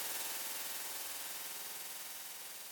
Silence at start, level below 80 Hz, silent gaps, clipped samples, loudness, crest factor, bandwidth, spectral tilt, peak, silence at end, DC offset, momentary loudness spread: 0 s; -88 dBFS; none; under 0.1%; -41 LUFS; 20 dB; 19 kHz; 1.5 dB/octave; -24 dBFS; 0 s; under 0.1%; 6 LU